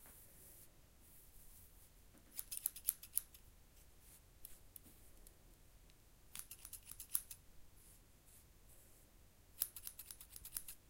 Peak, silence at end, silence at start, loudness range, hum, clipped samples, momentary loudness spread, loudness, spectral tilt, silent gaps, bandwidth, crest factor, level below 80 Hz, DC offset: -14 dBFS; 0 s; 0 s; 11 LU; none; under 0.1%; 24 LU; -46 LUFS; -0.5 dB/octave; none; 17 kHz; 38 dB; -68 dBFS; under 0.1%